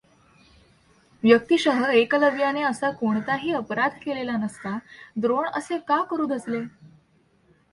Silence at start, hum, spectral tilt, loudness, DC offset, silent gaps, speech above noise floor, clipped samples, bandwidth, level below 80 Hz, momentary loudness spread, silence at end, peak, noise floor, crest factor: 1.25 s; none; -5 dB/octave; -23 LUFS; under 0.1%; none; 39 dB; under 0.1%; 11.5 kHz; -64 dBFS; 12 LU; 0.85 s; -4 dBFS; -62 dBFS; 22 dB